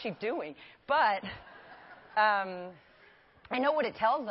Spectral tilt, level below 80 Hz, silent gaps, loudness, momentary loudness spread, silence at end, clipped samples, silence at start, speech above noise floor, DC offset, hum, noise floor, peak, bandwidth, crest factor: -8 dB/octave; -68 dBFS; none; -30 LUFS; 23 LU; 0 s; under 0.1%; 0 s; 30 dB; under 0.1%; none; -60 dBFS; -14 dBFS; 5.8 kHz; 18 dB